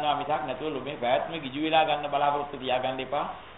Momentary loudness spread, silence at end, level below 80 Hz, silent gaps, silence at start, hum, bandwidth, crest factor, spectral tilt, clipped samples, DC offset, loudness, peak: 8 LU; 0 s; -58 dBFS; none; 0 s; none; 4.1 kHz; 18 dB; -2 dB/octave; under 0.1%; 0.1%; -28 LUFS; -10 dBFS